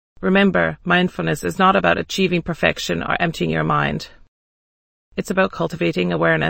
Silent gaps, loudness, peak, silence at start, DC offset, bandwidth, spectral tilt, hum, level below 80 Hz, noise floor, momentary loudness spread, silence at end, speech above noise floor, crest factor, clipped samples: 4.28-5.12 s; -19 LUFS; -2 dBFS; 0.2 s; under 0.1%; 16.5 kHz; -5.5 dB/octave; none; -44 dBFS; under -90 dBFS; 8 LU; 0 s; over 71 dB; 18 dB; under 0.1%